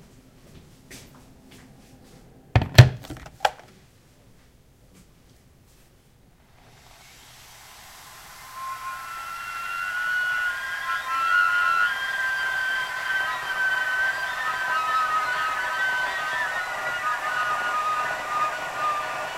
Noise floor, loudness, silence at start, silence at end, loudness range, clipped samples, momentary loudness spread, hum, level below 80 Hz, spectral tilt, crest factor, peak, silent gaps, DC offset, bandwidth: -56 dBFS; -24 LUFS; 0.45 s; 0 s; 13 LU; under 0.1%; 22 LU; none; -46 dBFS; -4.5 dB/octave; 26 dB; 0 dBFS; none; under 0.1%; 16 kHz